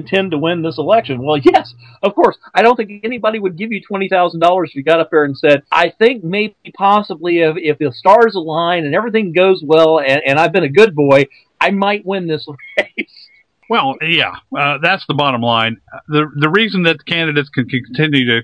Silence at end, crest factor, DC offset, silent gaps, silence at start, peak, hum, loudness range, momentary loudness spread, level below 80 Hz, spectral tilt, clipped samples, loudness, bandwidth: 0 s; 14 dB; under 0.1%; none; 0 s; 0 dBFS; none; 4 LU; 9 LU; -56 dBFS; -6.5 dB/octave; 0.3%; -14 LUFS; 11 kHz